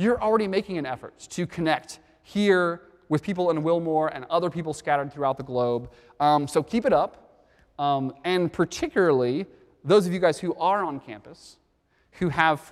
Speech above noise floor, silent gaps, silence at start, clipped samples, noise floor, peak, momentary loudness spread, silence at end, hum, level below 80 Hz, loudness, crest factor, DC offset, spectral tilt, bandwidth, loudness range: 42 dB; none; 0 s; under 0.1%; -67 dBFS; -4 dBFS; 11 LU; 0 s; none; -58 dBFS; -25 LUFS; 22 dB; under 0.1%; -6 dB/octave; 14 kHz; 2 LU